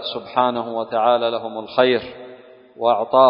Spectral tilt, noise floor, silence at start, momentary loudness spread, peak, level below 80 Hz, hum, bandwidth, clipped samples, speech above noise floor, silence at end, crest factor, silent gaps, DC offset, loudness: -9.5 dB/octave; -43 dBFS; 0 s; 13 LU; 0 dBFS; -62 dBFS; none; 5.4 kHz; under 0.1%; 24 dB; 0 s; 18 dB; none; under 0.1%; -20 LUFS